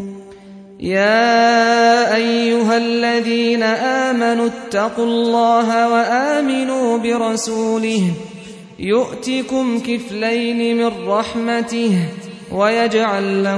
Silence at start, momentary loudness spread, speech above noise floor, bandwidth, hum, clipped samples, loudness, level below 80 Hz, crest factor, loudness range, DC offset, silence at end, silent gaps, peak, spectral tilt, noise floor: 0 s; 9 LU; 22 dB; 11 kHz; none; under 0.1%; -16 LUFS; -56 dBFS; 14 dB; 5 LU; under 0.1%; 0 s; none; -2 dBFS; -4.5 dB/octave; -38 dBFS